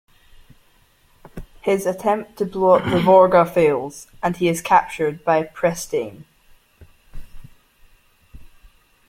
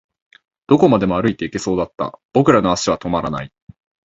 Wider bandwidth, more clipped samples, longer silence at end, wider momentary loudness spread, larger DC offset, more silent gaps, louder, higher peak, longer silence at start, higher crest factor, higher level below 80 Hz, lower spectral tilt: first, 16 kHz vs 8 kHz; neither; about the same, 0.65 s vs 0.55 s; about the same, 13 LU vs 12 LU; neither; second, none vs 2.25-2.29 s; about the same, -18 LUFS vs -17 LUFS; about the same, -2 dBFS vs 0 dBFS; first, 1.35 s vs 0.7 s; about the same, 20 dB vs 18 dB; about the same, -46 dBFS vs -46 dBFS; about the same, -5.5 dB/octave vs -6 dB/octave